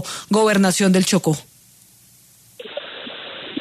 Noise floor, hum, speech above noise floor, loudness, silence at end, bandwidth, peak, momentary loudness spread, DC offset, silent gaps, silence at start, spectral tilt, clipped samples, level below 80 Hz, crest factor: -51 dBFS; none; 34 dB; -17 LUFS; 0 s; 14 kHz; -4 dBFS; 17 LU; under 0.1%; none; 0 s; -4.5 dB/octave; under 0.1%; -62 dBFS; 16 dB